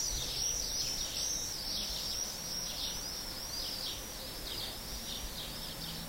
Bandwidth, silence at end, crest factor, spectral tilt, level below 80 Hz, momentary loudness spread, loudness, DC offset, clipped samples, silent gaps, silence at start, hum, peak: 16 kHz; 0 s; 16 dB; -1 dB/octave; -50 dBFS; 7 LU; -36 LUFS; under 0.1%; under 0.1%; none; 0 s; none; -22 dBFS